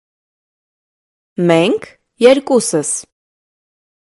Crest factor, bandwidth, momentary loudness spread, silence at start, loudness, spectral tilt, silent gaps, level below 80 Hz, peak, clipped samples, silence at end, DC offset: 18 dB; 12 kHz; 11 LU; 1.4 s; -14 LUFS; -4.5 dB/octave; none; -62 dBFS; 0 dBFS; under 0.1%; 1.15 s; under 0.1%